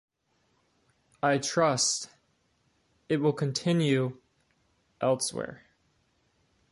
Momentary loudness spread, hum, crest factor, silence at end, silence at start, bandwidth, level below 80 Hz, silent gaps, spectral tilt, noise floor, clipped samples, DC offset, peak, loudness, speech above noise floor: 10 LU; none; 20 dB; 1.15 s; 1.25 s; 11.5 kHz; -70 dBFS; none; -4 dB/octave; -73 dBFS; under 0.1%; under 0.1%; -12 dBFS; -28 LUFS; 45 dB